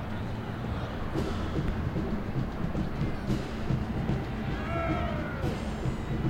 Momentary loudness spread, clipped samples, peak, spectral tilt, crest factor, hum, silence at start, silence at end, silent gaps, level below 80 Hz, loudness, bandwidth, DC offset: 4 LU; under 0.1%; -16 dBFS; -7.5 dB/octave; 14 dB; none; 0 s; 0 s; none; -38 dBFS; -33 LUFS; 16 kHz; under 0.1%